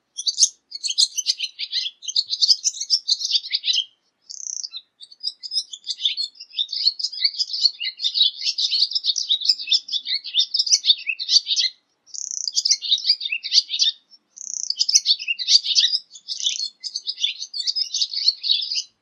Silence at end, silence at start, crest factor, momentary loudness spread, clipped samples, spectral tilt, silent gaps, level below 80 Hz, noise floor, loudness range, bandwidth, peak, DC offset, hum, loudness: 0.15 s; 0.15 s; 22 dB; 12 LU; under 0.1%; 8 dB/octave; none; under -90 dBFS; -48 dBFS; 5 LU; 13.5 kHz; 0 dBFS; under 0.1%; none; -19 LUFS